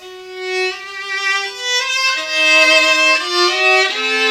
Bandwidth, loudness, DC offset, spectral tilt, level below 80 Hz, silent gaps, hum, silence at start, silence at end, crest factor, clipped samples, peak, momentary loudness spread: 16.5 kHz; -13 LUFS; under 0.1%; 1.5 dB/octave; -66 dBFS; none; none; 0 s; 0 s; 16 dB; under 0.1%; 0 dBFS; 13 LU